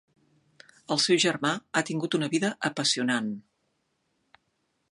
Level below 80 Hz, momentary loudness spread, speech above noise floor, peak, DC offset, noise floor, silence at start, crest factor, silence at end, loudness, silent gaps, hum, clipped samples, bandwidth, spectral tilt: -76 dBFS; 7 LU; 49 dB; -8 dBFS; under 0.1%; -75 dBFS; 0.9 s; 22 dB; 1.5 s; -26 LUFS; none; none; under 0.1%; 11.5 kHz; -3.5 dB/octave